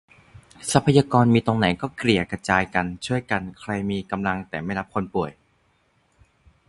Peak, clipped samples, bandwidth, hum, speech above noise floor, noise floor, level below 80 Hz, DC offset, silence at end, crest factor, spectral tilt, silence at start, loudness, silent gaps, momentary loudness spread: 0 dBFS; under 0.1%; 11.5 kHz; none; 42 dB; -65 dBFS; -48 dBFS; under 0.1%; 1.35 s; 24 dB; -5.5 dB/octave; 0.6 s; -23 LUFS; none; 10 LU